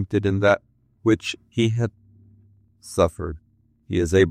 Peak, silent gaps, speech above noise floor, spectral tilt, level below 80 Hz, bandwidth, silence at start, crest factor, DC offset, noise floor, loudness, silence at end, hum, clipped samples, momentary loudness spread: -4 dBFS; none; 35 dB; -6.5 dB/octave; -48 dBFS; 14.5 kHz; 0 s; 18 dB; under 0.1%; -56 dBFS; -23 LUFS; 0 s; none; under 0.1%; 11 LU